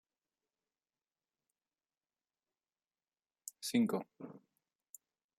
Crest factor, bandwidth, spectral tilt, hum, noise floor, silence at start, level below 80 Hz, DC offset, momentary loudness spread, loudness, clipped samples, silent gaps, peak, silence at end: 22 dB; 16 kHz; -4.5 dB/octave; none; under -90 dBFS; 3.45 s; -90 dBFS; under 0.1%; 25 LU; -37 LUFS; under 0.1%; none; -22 dBFS; 1 s